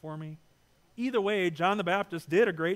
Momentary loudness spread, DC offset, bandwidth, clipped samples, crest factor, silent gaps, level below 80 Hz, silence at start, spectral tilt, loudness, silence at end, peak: 14 LU; under 0.1%; 15.5 kHz; under 0.1%; 18 dB; none; -72 dBFS; 0.05 s; -6 dB/octave; -28 LUFS; 0 s; -12 dBFS